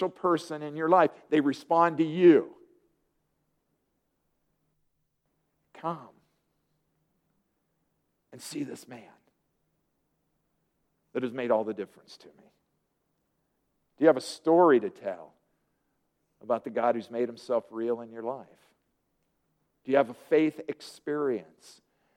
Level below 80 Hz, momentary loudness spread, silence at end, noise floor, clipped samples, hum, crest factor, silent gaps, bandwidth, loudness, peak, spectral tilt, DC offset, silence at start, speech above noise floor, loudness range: -82 dBFS; 18 LU; 0.75 s; -77 dBFS; under 0.1%; none; 22 dB; none; 12.5 kHz; -27 LUFS; -8 dBFS; -6.5 dB/octave; under 0.1%; 0 s; 50 dB; 19 LU